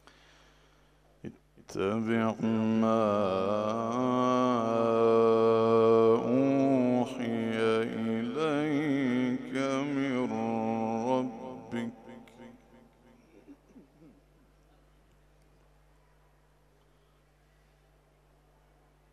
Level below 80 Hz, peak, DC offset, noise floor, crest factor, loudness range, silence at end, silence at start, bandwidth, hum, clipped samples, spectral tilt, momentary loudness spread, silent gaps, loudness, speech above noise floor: -68 dBFS; -14 dBFS; under 0.1%; -65 dBFS; 18 dB; 11 LU; 5.35 s; 1.25 s; 9.6 kHz; 50 Hz at -65 dBFS; under 0.1%; -7 dB/octave; 14 LU; none; -28 LUFS; 38 dB